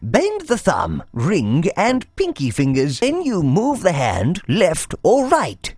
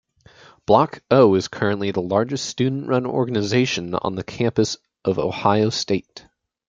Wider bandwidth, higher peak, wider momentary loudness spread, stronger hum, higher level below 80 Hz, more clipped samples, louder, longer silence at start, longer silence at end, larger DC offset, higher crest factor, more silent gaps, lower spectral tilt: first, 11 kHz vs 9 kHz; about the same, 0 dBFS vs -2 dBFS; second, 4 LU vs 8 LU; neither; first, -42 dBFS vs -56 dBFS; neither; first, -18 LUFS vs -21 LUFS; second, 0 s vs 0.7 s; second, 0 s vs 0.5 s; neither; about the same, 18 dB vs 18 dB; neither; about the same, -5.5 dB/octave vs -5.5 dB/octave